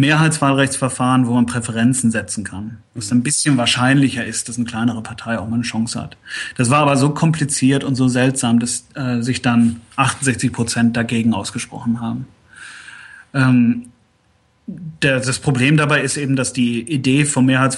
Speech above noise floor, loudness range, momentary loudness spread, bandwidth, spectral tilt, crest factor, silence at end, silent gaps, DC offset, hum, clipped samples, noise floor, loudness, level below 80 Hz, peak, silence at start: 42 dB; 4 LU; 13 LU; 12 kHz; -4.5 dB/octave; 16 dB; 0 s; none; under 0.1%; none; under 0.1%; -58 dBFS; -17 LUFS; -52 dBFS; -2 dBFS; 0 s